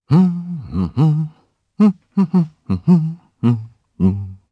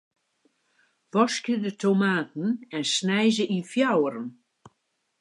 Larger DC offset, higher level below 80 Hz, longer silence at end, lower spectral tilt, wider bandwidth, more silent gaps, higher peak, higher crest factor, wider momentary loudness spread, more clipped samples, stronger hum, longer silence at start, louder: neither; first, -46 dBFS vs -80 dBFS; second, 0.15 s vs 0.9 s; first, -10.5 dB/octave vs -4.5 dB/octave; second, 5.6 kHz vs 11.5 kHz; neither; first, -2 dBFS vs -8 dBFS; about the same, 14 dB vs 18 dB; first, 10 LU vs 7 LU; neither; neither; second, 0.1 s vs 1.15 s; first, -18 LUFS vs -25 LUFS